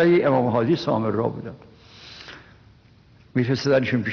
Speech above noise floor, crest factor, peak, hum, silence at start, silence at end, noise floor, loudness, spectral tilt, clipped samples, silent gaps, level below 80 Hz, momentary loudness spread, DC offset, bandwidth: 32 dB; 14 dB; -8 dBFS; none; 0 s; 0 s; -53 dBFS; -22 LUFS; -6 dB/octave; under 0.1%; none; -58 dBFS; 21 LU; under 0.1%; 6.6 kHz